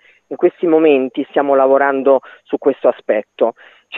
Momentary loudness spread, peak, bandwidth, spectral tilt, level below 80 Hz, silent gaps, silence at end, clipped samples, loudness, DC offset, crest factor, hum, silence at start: 8 LU; 0 dBFS; 4 kHz; -8 dB/octave; -72 dBFS; none; 0 s; under 0.1%; -15 LUFS; under 0.1%; 14 dB; none; 0.3 s